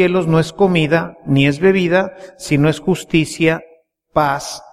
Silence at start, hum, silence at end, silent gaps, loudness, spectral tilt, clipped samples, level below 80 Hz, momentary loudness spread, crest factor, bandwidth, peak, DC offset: 0 s; none; 0.15 s; none; -16 LUFS; -6 dB/octave; under 0.1%; -44 dBFS; 8 LU; 16 dB; 14.5 kHz; 0 dBFS; under 0.1%